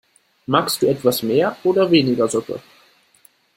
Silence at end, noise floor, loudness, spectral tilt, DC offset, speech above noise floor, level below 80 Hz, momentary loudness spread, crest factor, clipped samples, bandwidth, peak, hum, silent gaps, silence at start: 1 s; -55 dBFS; -18 LUFS; -5 dB/octave; under 0.1%; 38 dB; -60 dBFS; 14 LU; 18 dB; under 0.1%; 16.5 kHz; -2 dBFS; none; none; 0.5 s